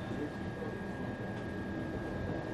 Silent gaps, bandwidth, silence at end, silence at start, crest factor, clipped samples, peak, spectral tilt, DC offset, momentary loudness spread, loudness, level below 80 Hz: none; 12.5 kHz; 0 s; 0 s; 12 dB; under 0.1%; -26 dBFS; -7.5 dB/octave; under 0.1%; 2 LU; -40 LUFS; -54 dBFS